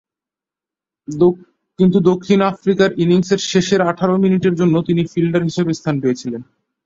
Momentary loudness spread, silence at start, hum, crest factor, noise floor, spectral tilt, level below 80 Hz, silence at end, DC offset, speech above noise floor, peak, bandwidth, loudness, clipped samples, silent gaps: 6 LU; 1.1 s; none; 14 dB; -88 dBFS; -6.5 dB/octave; -54 dBFS; 0.4 s; under 0.1%; 73 dB; -2 dBFS; 7.8 kHz; -16 LUFS; under 0.1%; none